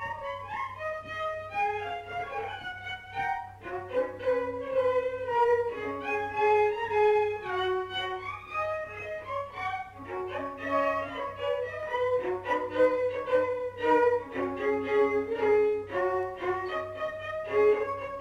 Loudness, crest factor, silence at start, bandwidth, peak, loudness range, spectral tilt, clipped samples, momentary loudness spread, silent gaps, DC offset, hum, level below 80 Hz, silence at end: -30 LUFS; 16 dB; 0 s; 10 kHz; -14 dBFS; 6 LU; -5.5 dB/octave; under 0.1%; 11 LU; none; under 0.1%; none; -60 dBFS; 0 s